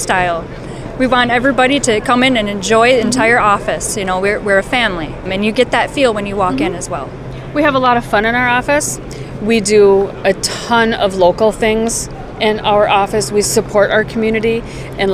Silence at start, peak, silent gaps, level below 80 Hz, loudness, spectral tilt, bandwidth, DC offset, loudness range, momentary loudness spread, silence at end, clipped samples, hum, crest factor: 0 s; 0 dBFS; none; -34 dBFS; -13 LUFS; -4 dB/octave; 15.5 kHz; under 0.1%; 3 LU; 11 LU; 0 s; under 0.1%; none; 12 dB